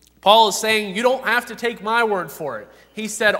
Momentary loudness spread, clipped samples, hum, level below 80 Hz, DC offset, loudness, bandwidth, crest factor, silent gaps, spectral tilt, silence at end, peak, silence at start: 16 LU; under 0.1%; none; -62 dBFS; under 0.1%; -18 LUFS; 16 kHz; 20 dB; none; -2 dB/octave; 0 s; 0 dBFS; 0.25 s